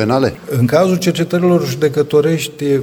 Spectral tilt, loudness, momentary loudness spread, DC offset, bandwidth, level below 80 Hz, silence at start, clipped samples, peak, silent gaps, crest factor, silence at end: -6.5 dB/octave; -14 LUFS; 4 LU; under 0.1%; 19 kHz; -50 dBFS; 0 s; under 0.1%; 0 dBFS; none; 14 dB; 0 s